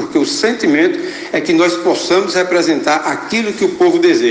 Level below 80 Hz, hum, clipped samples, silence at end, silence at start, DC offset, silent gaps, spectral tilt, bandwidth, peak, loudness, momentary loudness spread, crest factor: -58 dBFS; none; under 0.1%; 0 s; 0 s; under 0.1%; none; -3.5 dB/octave; 9.6 kHz; 0 dBFS; -14 LUFS; 5 LU; 12 dB